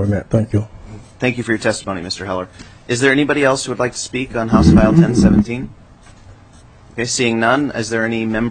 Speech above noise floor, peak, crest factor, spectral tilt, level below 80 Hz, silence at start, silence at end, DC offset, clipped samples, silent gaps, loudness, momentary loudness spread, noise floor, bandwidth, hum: 28 dB; 0 dBFS; 16 dB; -5.5 dB/octave; -32 dBFS; 0 s; 0 s; under 0.1%; under 0.1%; none; -16 LUFS; 13 LU; -43 dBFS; 9.4 kHz; none